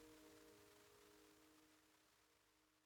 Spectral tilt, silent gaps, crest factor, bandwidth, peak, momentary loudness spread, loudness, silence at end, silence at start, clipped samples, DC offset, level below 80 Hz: -3 dB/octave; none; 16 dB; 19.5 kHz; -54 dBFS; 3 LU; -68 LUFS; 0 s; 0 s; under 0.1%; under 0.1%; -88 dBFS